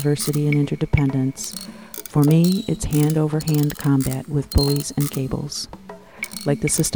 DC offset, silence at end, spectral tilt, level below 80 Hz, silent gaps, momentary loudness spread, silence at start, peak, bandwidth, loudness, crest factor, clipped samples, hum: 0.2%; 0 s; -5.5 dB/octave; -36 dBFS; none; 14 LU; 0 s; -4 dBFS; over 20 kHz; -21 LUFS; 16 dB; under 0.1%; none